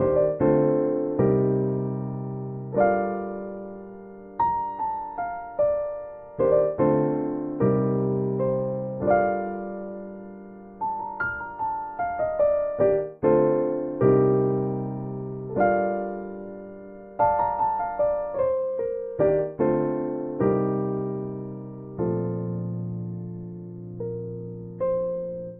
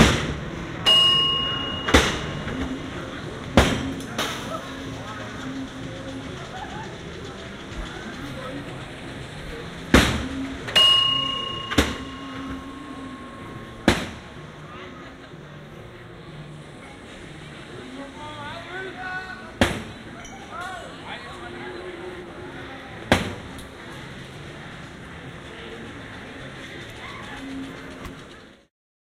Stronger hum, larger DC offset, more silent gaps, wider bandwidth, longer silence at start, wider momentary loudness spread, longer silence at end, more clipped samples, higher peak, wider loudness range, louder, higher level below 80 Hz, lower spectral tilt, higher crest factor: neither; neither; neither; second, 3.2 kHz vs 16 kHz; about the same, 0 s vs 0 s; second, 16 LU vs 21 LU; second, 0 s vs 0.55 s; neither; second, -8 dBFS vs -2 dBFS; second, 6 LU vs 17 LU; about the same, -25 LUFS vs -24 LUFS; second, -54 dBFS vs -40 dBFS; first, -10.5 dB/octave vs -3.5 dB/octave; second, 18 dB vs 26 dB